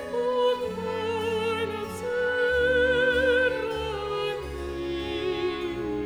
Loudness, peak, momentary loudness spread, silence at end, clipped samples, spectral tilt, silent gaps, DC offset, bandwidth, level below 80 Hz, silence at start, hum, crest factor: -26 LUFS; -12 dBFS; 9 LU; 0 s; under 0.1%; -5 dB/octave; none; under 0.1%; 14 kHz; -46 dBFS; 0 s; none; 14 dB